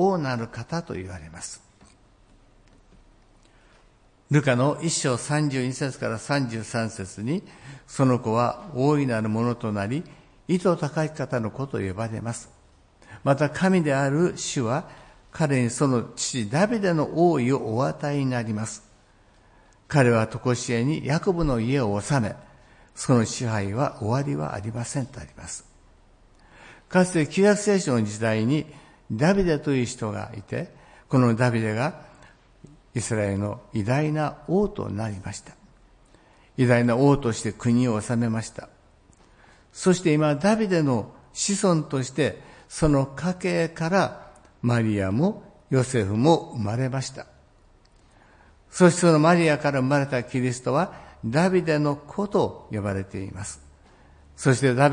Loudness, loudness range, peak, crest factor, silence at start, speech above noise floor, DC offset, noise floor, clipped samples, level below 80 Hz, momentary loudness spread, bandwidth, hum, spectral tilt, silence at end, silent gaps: -24 LUFS; 5 LU; -4 dBFS; 22 dB; 0 s; 34 dB; under 0.1%; -57 dBFS; under 0.1%; -50 dBFS; 15 LU; 10.5 kHz; none; -6 dB/octave; 0 s; none